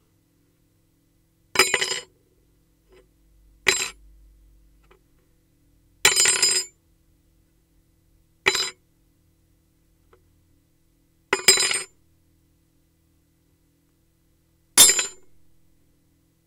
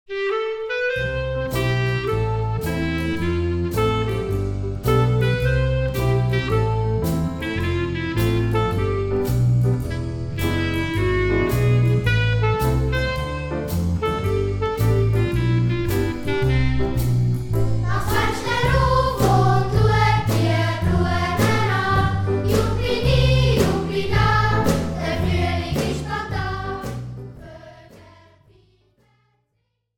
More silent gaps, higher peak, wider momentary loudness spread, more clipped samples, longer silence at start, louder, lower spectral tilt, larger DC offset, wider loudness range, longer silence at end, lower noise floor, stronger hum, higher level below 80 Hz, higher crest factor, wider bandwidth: neither; first, 0 dBFS vs -4 dBFS; first, 17 LU vs 7 LU; neither; first, 1.55 s vs 0.1 s; about the same, -19 LUFS vs -21 LUFS; second, 1 dB/octave vs -6.5 dB/octave; neither; first, 9 LU vs 4 LU; second, 1.35 s vs 1.95 s; second, -64 dBFS vs -72 dBFS; neither; second, -60 dBFS vs -30 dBFS; first, 28 dB vs 16 dB; second, 16.5 kHz vs 18.5 kHz